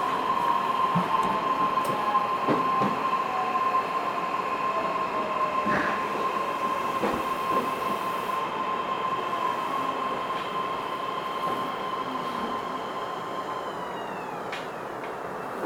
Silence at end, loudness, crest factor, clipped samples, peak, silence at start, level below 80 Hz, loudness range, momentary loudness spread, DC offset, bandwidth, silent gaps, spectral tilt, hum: 0 s; -28 LUFS; 16 dB; under 0.1%; -12 dBFS; 0 s; -62 dBFS; 6 LU; 8 LU; under 0.1%; 18 kHz; none; -5 dB/octave; none